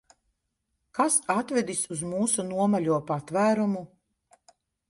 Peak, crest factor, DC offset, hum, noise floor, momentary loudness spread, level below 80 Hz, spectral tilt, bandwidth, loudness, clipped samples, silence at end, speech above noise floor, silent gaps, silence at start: -10 dBFS; 18 dB; under 0.1%; none; -79 dBFS; 6 LU; -68 dBFS; -4.5 dB/octave; 11.5 kHz; -26 LUFS; under 0.1%; 1.05 s; 53 dB; none; 0.95 s